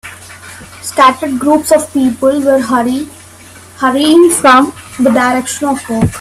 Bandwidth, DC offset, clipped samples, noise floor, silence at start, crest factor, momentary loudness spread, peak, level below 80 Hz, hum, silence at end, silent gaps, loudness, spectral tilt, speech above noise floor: 15.5 kHz; under 0.1%; under 0.1%; -35 dBFS; 0.05 s; 12 dB; 19 LU; 0 dBFS; -42 dBFS; none; 0 s; none; -10 LUFS; -4 dB/octave; 26 dB